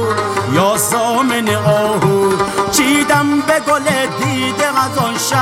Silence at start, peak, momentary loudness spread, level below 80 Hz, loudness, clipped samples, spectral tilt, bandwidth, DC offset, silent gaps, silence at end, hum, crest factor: 0 s; 0 dBFS; 4 LU; -48 dBFS; -14 LUFS; under 0.1%; -4 dB/octave; 17 kHz; under 0.1%; none; 0 s; none; 14 dB